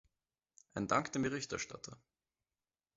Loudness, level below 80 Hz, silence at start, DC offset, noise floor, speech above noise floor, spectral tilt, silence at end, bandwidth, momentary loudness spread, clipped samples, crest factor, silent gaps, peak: -38 LUFS; -70 dBFS; 0.75 s; under 0.1%; under -90 dBFS; over 52 dB; -4 dB/octave; 1 s; 7.6 kHz; 15 LU; under 0.1%; 24 dB; none; -18 dBFS